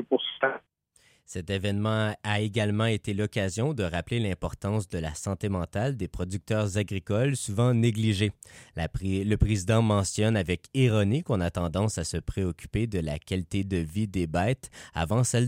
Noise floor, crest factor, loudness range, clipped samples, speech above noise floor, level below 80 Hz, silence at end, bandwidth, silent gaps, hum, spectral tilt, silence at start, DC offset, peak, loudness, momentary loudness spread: -64 dBFS; 18 dB; 4 LU; under 0.1%; 37 dB; -44 dBFS; 0 s; 15.5 kHz; none; none; -5.5 dB/octave; 0 s; under 0.1%; -8 dBFS; -28 LUFS; 8 LU